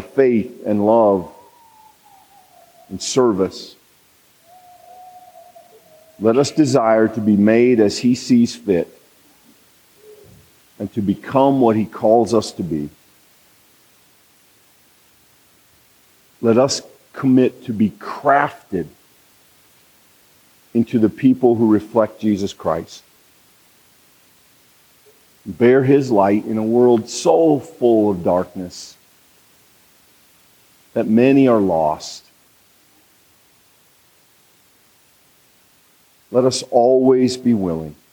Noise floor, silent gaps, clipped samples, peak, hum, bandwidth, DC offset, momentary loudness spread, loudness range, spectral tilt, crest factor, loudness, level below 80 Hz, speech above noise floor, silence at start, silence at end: -55 dBFS; none; under 0.1%; -2 dBFS; none; over 20 kHz; under 0.1%; 14 LU; 8 LU; -6 dB/octave; 18 dB; -17 LUFS; -60 dBFS; 39 dB; 0 s; 0.2 s